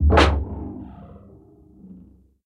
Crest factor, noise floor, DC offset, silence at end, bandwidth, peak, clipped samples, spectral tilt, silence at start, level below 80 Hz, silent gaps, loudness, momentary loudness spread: 20 dB; -49 dBFS; under 0.1%; 0.55 s; 10.5 kHz; -2 dBFS; under 0.1%; -6.5 dB/octave; 0 s; -26 dBFS; none; -21 LUFS; 28 LU